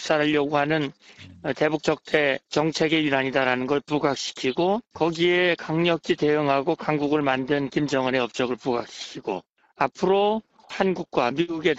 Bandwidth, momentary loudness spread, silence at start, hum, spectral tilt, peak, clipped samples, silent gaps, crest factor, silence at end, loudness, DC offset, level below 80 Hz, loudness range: 8.2 kHz; 8 LU; 0 s; none; -5 dB/octave; -6 dBFS; under 0.1%; 9.50-9.55 s; 18 dB; 0 s; -24 LUFS; under 0.1%; -60 dBFS; 3 LU